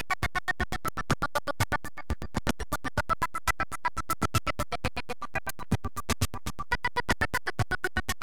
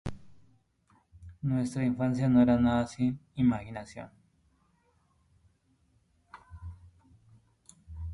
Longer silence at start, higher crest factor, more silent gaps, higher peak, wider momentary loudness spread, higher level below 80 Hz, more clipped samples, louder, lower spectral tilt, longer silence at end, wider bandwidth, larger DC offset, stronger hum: about the same, 0.1 s vs 0.05 s; about the same, 20 dB vs 20 dB; neither; about the same, -12 dBFS vs -12 dBFS; second, 6 LU vs 24 LU; first, -42 dBFS vs -52 dBFS; neither; second, -31 LUFS vs -28 LUFS; second, -4 dB/octave vs -8 dB/octave; about the same, 0.1 s vs 0 s; first, 18 kHz vs 11 kHz; first, 2% vs under 0.1%; neither